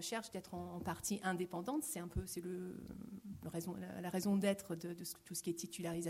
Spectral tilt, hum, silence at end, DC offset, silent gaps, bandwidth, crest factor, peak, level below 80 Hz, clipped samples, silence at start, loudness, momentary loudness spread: -4.5 dB/octave; none; 0 s; under 0.1%; none; 16 kHz; 18 dB; -24 dBFS; -60 dBFS; under 0.1%; 0 s; -43 LUFS; 11 LU